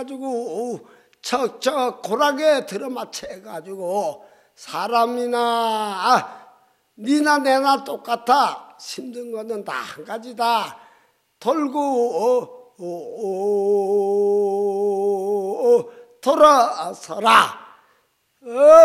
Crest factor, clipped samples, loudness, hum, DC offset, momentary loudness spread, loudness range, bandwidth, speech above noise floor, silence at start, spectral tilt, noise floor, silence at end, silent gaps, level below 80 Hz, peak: 20 dB; under 0.1%; -20 LUFS; none; under 0.1%; 17 LU; 6 LU; 15.5 kHz; 45 dB; 0 s; -3.5 dB/octave; -64 dBFS; 0 s; none; -68 dBFS; 0 dBFS